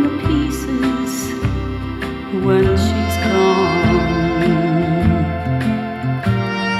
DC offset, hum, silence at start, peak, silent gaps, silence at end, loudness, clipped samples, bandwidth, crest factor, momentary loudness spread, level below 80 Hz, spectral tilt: under 0.1%; none; 0 s; -2 dBFS; none; 0 s; -17 LUFS; under 0.1%; 15 kHz; 14 dB; 7 LU; -30 dBFS; -6.5 dB/octave